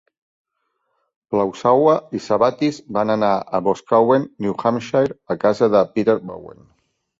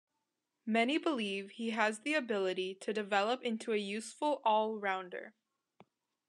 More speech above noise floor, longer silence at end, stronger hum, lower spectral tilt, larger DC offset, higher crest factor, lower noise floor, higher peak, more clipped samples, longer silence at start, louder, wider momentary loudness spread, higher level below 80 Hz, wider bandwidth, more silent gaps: about the same, 54 dB vs 52 dB; second, 0.7 s vs 1 s; neither; first, -7 dB/octave vs -4 dB/octave; neither; about the same, 18 dB vs 20 dB; second, -72 dBFS vs -86 dBFS; first, -2 dBFS vs -16 dBFS; neither; first, 1.3 s vs 0.65 s; first, -18 LUFS vs -35 LUFS; about the same, 8 LU vs 9 LU; first, -58 dBFS vs under -90 dBFS; second, 7.8 kHz vs 11.5 kHz; neither